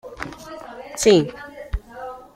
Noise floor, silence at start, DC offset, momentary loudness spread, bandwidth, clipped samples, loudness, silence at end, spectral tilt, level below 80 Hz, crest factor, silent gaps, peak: -37 dBFS; 0.05 s; under 0.1%; 21 LU; 15.5 kHz; under 0.1%; -19 LUFS; 0.15 s; -4.5 dB/octave; -36 dBFS; 20 dB; none; -4 dBFS